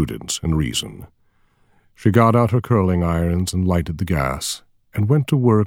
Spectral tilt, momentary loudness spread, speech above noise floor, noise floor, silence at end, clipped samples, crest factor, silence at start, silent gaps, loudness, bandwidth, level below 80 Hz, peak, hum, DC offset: -6 dB/octave; 10 LU; 41 dB; -59 dBFS; 0 s; under 0.1%; 18 dB; 0 s; none; -19 LUFS; 17 kHz; -36 dBFS; 0 dBFS; none; under 0.1%